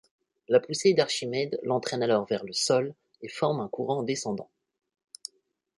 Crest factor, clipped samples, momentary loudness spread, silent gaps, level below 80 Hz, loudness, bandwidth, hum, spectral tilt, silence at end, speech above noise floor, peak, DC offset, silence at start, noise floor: 20 dB; under 0.1%; 18 LU; none; -72 dBFS; -27 LUFS; 11.5 kHz; none; -4 dB/octave; 1.35 s; 42 dB; -8 dBFS; under 0.1%; 0.5 s; -69 dBFS